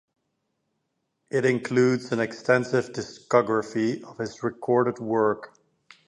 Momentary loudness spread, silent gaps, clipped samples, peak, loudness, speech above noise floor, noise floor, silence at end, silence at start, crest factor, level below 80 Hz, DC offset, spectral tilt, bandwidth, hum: 10 LU; none; under 0.1%; -4 dBFS; -25 LUFS; 53 dB; -77 dBFS; 0.6 s; 1.35 s; 22 dB; -68 dBFS; under 0.1%; -6 dB/octave; 11 kHz; none